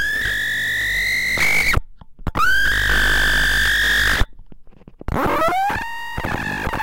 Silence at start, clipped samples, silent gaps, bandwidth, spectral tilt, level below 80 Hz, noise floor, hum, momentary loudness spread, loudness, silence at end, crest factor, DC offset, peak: 0 s; under 0.1%; none; 17 kHz; -2.5 dB/octave; -30 dBFS; -39 dBFS; none; 11 LU; -18 LUFS; 0 s; 16 dB; under 0.1%; -2 dBFS